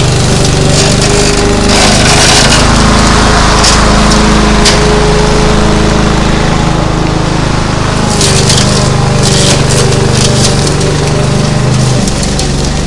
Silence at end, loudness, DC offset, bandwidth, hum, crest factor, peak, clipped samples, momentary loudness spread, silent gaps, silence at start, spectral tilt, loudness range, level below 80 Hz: 0 s; -7 LUFS; under 0.1%; 12 kHz; none; 6 dB; 0 dBFS; 2%; 6 LU; none; 0 s; -4 dB/octave; 3 LU; -14 dBFS